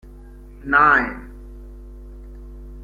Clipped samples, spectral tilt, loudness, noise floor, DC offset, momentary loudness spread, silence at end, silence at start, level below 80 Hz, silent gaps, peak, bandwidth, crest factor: under 0.1%; -6.5 dB/octave; -16 LUFS; -40 dBFS; under 0.1%; 27 LU; 0 s; 0.6 s; -38 dBFS; none; -2 dBFS; 7.2 kHz; 22 dB